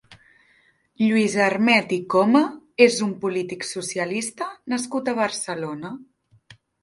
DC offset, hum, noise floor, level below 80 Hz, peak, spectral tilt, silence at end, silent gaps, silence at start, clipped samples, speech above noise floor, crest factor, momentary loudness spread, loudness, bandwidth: under 0.1%; none; -61 dBFS; -68 dBFS; 0 dBFS; -4 dB/octave; 0.8 s; none; 0.1 s; under 0.1%; 40 dB; 22 dB; 12 LU; -22 LUFS; 11.5 kHz